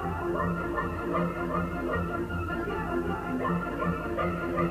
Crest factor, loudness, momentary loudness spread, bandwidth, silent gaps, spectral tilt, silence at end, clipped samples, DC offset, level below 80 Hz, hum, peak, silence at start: 14 dB; -31 LUFS; 2 LU; 15.5 kHz; none; -8 dB/octave; 0 s; under 0.1%; under 0.1%; -44 dBFS; none; -16 dBFS; 0 s